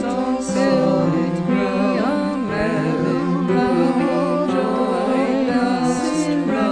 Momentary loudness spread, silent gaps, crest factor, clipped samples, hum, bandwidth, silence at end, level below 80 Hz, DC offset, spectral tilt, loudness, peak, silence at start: 3 LU; none; 12 dB; under 0.1%; none; 10.5 kHz; 0 s; -48 dBFS; under 0.1%; -6.5 dB/octave; -19 LUFS; -6 dBFS; 0 s